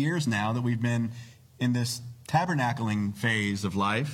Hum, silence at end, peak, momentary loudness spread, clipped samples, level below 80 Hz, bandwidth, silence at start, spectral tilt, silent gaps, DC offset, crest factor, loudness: none; 0 s; -10 dBFS; 5 LU; under 0.1%; -66 dBFS; 16 kHz; 0 s; -5.5 dB/octave; none; under 0.1%; 18 dB; -28 LUFS